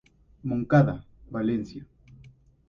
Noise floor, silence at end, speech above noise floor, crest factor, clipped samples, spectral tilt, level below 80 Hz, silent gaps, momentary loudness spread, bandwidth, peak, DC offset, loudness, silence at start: -54 dBFS; 0.85 s; 29 dB; 20 dB; under 0.1%; -9.5 dB/octave; -54 dBFS; none; 18 LU; 6.8 kHz; -8 dBFS; under 0.1%; -26 LUFS; 0.45 s